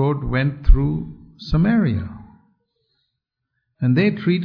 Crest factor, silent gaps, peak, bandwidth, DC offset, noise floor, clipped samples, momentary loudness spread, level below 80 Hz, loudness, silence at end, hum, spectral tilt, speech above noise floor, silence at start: 18 dB; none; -2 dBFS; 5.4 kHz; under 0.1%; -78 dBFS; under 0.1%; 17 LU; -24 dBFS; -20 LUFS; 0 s; none; -9.5 dB/octave; 61 dB; 0 s